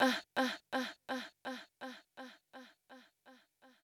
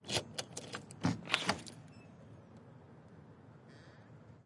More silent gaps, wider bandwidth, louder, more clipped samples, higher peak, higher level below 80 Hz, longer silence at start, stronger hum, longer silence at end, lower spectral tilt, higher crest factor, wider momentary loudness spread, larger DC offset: neither; first, 18.5 kHz vs 11.5 kHz; about the same, -40 LUFS vs -38 LUFS; neither; second, -18 dBFS vs -8 dBFS; second, -88 dBFS vs -74 dBFS; about the same, 0 s vs 0 s; neither; about the same, 0.15 s vs 0.05 s; about the same, -2.5 dB/octave vs -3.5 dB/octave; second, 24 dB vs 34 dB; about the same, 22 LU vs 23 LU; neither